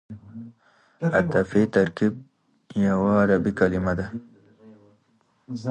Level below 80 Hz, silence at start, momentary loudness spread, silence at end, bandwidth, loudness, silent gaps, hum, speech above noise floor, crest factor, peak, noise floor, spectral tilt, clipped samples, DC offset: -48 dBFS; 0.1 s; 20 LU; 0 s; 8.8 kHz; -23 LUFS; none; none; 43 dB; 18 dB; -6 dBFS; -65 dBFS; -8 dB/octave; under 0.1%; under 0.1%